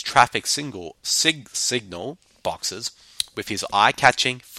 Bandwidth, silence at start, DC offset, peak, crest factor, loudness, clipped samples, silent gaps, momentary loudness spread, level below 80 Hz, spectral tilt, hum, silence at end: 16.5 kHz; 0 s; under 0.1%; 0 dBFS; 24 dB; -21 LUFS; under 0.1%; none; 15 LU; -58 dBFS; -1.5 dB/octave; none; 0 s